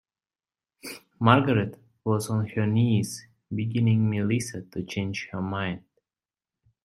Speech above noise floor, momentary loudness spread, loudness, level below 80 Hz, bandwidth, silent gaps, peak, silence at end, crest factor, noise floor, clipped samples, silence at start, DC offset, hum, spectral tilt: over 65 dB; 18 LU; -26 LUFS; -62 dBFS; 13.5 kHz; none; -2 dBFS; 1.05 s; 24 dB; under -90 dBFS; under 0.1%; 0.85 s; under 0.1%; none; -6.5 dB/octave